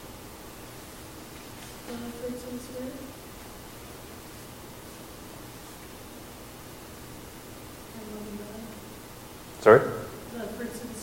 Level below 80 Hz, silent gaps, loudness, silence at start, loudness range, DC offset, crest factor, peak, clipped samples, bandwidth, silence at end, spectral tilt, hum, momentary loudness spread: -54 dBFS; none; -28 LUFS; 0 s; 16 LU; under 0.1%; 30 dB; -2 dBFS; under 0.1%; 16.5 kHz; 0 s; -5 dB/octave; none; 9 LU